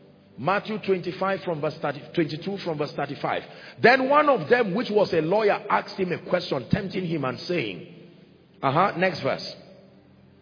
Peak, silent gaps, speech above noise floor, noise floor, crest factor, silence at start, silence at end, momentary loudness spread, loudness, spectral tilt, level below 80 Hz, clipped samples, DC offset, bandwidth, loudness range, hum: -4 dBFS; none; 29 dB; -53 dBFS; 22 dB; 0.4 s; 0.7 s; 11 LU; -24 LUFS; -7 dB/octave; -60 dBFS; under 0.1%; under 0.1%; 5.4 kHz; 6 LU; none